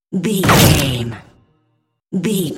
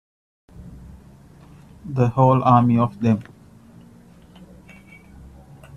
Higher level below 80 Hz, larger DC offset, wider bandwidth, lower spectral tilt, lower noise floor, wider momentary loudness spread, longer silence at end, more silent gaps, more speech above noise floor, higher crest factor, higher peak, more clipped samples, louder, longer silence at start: first, -34 dBFS vs -50 dBFS; neither; first, 17 kHz vs 7 kHz; second, -4.5 dB/octave vs -9.5 dB/octave; first, -65 dBFS vs -47 dBFS; second, 16 LU vs 27 LU; second, 0 s vs 2.55 s; neither; first, 51 dB vs 31 dB; about the same, 16 dB vs 20 dB; about the same, 0 dBFS vs -2 dBFS; neither; first, -14 LUFS vs -18 LUFS; second, 0.1 s vs 0.6 s